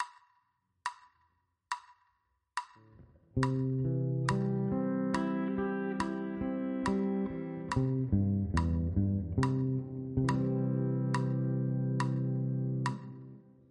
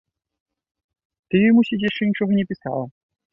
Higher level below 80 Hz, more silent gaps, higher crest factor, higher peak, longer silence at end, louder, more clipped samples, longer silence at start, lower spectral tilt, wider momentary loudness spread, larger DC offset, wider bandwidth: first, -50 dBFS vs -60 dBFS; neither; about the same, 18 dB vs 16 dB; second, -14 dBFS vs -6 dBFS; second, 0.3 s vs 0.45 s; second, -33 LUFS vs -20 LUFS; neither; second, 0 s vs 1.3 s; about the same, -8 dB/octave vs -9 dB/octave; about the same, 11 LU vs 12 LU; neither; first, 10.5 kHz vs 5.6 kHz